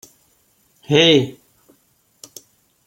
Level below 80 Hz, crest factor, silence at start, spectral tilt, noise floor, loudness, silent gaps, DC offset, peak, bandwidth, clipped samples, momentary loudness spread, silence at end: -62 dBFS; 20 dB; 0.9 s; -4.5 dB/octave; -61 dBFS; -15 LUFS; none; under 0.1%; -2 dBFS; 16.5 kHz; under 0.1%; 27 LU; 1.55 s